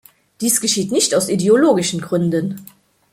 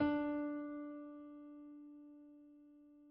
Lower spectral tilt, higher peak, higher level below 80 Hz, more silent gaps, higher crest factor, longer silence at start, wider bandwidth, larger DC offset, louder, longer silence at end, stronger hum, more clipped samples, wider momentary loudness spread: about the same, -4 dB/octave vs -5 dB/octave; first, -2 dBFS vs -26 dBFS; first, -58 dBFS vs -74 dBFS; neither; about the same, 16 dB vs 18 dB; first, 0.4 s vs 0 s; first, 16.5 kHz vs 5.2 kHz; neither; first, -16 LUFS vs -44 LUFS; first, 0.45 s vs 0 s; neither; neither; second, 9 LU vs 23 LU